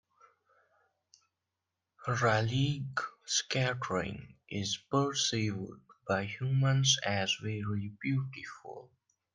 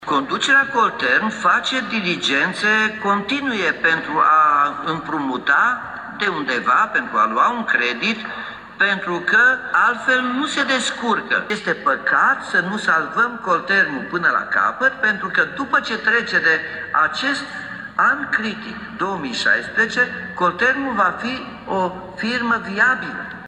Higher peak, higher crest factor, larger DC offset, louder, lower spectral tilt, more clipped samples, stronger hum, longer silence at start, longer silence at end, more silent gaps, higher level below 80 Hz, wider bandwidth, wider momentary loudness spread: second, -14 dBFS vs -4 dBFS; about the same, 20 dB vs 16 dB; neither; second, -32 LUFS vs -18 LUFS; about the same, -4 dB/octave vs -3.5 dB/octave; neither; neither; first, 2 s vs 0 s; first, 0.5 s vs 0 s; neither; second, -66 dBFS vs -58 dBFS; about the same, 10.5 kHz vs 11 kHz; first, 17 LU vs 9 LU